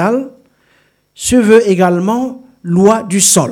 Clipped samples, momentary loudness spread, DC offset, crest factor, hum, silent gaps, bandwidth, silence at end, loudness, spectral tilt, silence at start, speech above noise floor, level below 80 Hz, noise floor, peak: 0.4%; 13 LU; under 0.1%; 12 dB; none; none; 17.5 kHz; 0 s; -11 LUFS; -4.5 dB/octave; 0 s; 44 dB; -44 dBFS; -55 dBFS; 0 dBFS